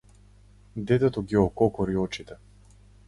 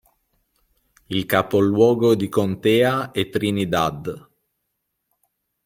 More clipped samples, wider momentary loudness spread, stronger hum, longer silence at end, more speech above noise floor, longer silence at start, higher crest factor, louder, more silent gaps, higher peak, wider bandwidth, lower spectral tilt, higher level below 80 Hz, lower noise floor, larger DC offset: neither; first, 15 LU vs 11 LU; first, 50 Hz at -40 dBFS vs none; second, 0.75 s vs 1.45 s; second, 29 dB vs 57 dB; second, 0.75 s vs 1.1 s; about the same, 20 dB vs 20 dB; second, -25 LUFS vs -20 LUFS; neither; second, -8 dBFS vs -2 dBFS; second, 11.5 kHz vs 16.5 kHz; first, -7.5 dB/octave vs -6 dB/octave; first, -48 dBFS vs -56 dBFS; second, -54 dBFS vs -76 dBFS; neither